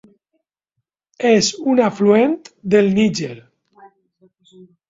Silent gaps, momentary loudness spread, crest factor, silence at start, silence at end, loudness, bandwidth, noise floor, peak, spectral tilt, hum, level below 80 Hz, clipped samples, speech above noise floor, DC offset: none; 11 LU; 16 dB; 1.2 s; 1.5 s; -16 LUFS; 8 kHz; -77 dBFS; -2 dBFS; -5 dB/octave; none; -58 dBFS; under 0.1%; 61 dB; under 0.1%